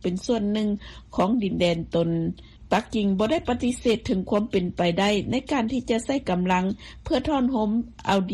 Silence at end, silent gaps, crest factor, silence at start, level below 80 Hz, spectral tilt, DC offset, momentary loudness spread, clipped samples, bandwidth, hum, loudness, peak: 0 s; none; 18 dB; 0.05 s; -46 dBFS; -6 dB/octave; under 0.1%; 5 LU; under 0.1%; 12 kHz; none; -25 LUFS; -6 dBFS